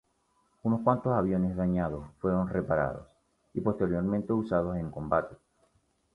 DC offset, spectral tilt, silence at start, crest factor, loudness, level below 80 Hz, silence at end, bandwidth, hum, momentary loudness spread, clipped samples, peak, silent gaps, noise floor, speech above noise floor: under 0.1%; -10.5 dB/octave; 0.65 s; 20 dB; -30 LUFS; -50 dBFS; 0.8 s; 4.2 kHz; none; 8 LU; under 0.1%; -10 dBFS; none; -72 dBFS; 43 dB